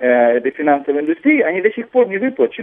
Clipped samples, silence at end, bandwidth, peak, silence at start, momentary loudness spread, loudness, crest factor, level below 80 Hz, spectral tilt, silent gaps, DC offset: under 0.1%; 0 s; 3.7 kHz; -2 dBFS; 0 s; 4 LU; -16 LUFS; 14 dB; -68 dBFS; -9 dB/octave; none; under 0.1%